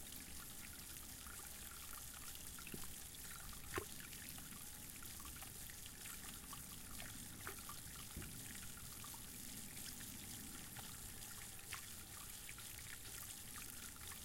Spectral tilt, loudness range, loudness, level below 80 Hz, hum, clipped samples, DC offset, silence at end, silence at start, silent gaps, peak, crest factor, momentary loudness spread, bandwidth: -2 dB/octave; 1 LU; -51 LUFS; -62 dBFS; none; under 0.1%; under 0.1%; 0 s; 0 s; none; -28 dBFS; 24 dB; 2 LU; 17 kHz